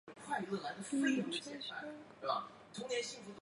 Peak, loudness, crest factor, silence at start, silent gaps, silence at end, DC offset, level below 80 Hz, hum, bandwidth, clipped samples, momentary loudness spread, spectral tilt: -22 dBFS; -40 LUFS; 18 dB; 0.05 s; none; 0 s; under 0.1%; -82 dBFS; none; 11 kHz; under 0.1%; 12 LU; -3.5 dB/octave